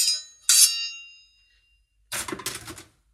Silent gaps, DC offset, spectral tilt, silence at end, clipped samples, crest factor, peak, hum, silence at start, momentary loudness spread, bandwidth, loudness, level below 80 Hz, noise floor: none; under 0.1%; 1.5 dB/octave; 0.3 s; under 0.1%; 24 dB; -2 dBFS; none; 0 s; 23 LU; 16 kHz; -21 LUFS; -62 dBFS; -65 dBFS